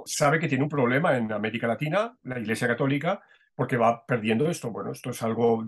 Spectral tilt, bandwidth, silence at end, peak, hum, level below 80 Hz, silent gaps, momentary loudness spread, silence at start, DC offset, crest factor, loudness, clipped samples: -5.5 dB/octave; 12.5 kHz; 0 s; -10 dBFS; none; -68 dBFS; none; 10 LU; 0 s; under 0.1%; 16 dB; -26 LUFS; under 0.1%